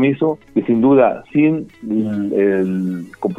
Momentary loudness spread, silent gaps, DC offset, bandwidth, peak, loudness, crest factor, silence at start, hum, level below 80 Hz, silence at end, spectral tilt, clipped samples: 10 LU; none; under 0.1%; 4 kHz; 0 dBFS; -17 LUFS; 16 dB; 0 s; none; -54 dBFS; 0 s; -9.5 dB/octave; under 0.1%